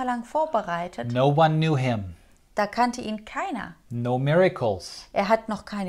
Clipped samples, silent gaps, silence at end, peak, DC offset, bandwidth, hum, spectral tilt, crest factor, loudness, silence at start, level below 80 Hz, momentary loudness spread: under 0.1%; none; 0 s; -6 dBFS; under 0.1%; 13 kHz; none; -6.5 dB/octave; 18 dB; -25 LUFS; 0 s; -56 dBFS; 12 LU